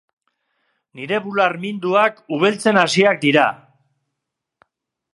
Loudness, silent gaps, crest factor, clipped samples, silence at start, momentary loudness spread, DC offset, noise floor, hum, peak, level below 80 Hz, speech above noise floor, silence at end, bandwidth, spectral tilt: -17 LUFS; none; 20 dB; under 0.1%; 0.95 s; 9 LU; under 0.1%; -81 dBFS; none; 0 dBFS; -70 dBFS; 63 dB; 1.55 s; 11.5 kHz; -4.5 dB/octave